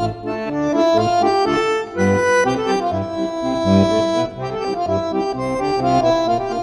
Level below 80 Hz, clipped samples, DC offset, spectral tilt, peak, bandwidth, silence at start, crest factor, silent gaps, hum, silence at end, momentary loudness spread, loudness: -46 dBFS; under 0.1%; under 0.1%; -6 dB/octave; -2 dBFS; 11.5 kHz; 0 s; 16 dB; none; none; 0 s; 8 LU; -18 LUFS